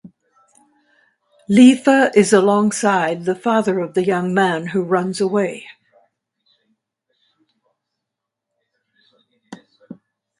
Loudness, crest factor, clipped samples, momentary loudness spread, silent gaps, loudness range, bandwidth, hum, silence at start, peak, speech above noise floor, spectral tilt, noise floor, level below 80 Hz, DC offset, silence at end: -16 LUFS; 18 dB; under 0.1%; 10 LU; none; 10 LU; 11.5 kHz; none; 0.05 s; 0 dBFS; 66 dB; -5.5 dB/octave; -82 dBFS; -64 dBFS; under 0.1%; 0.45 s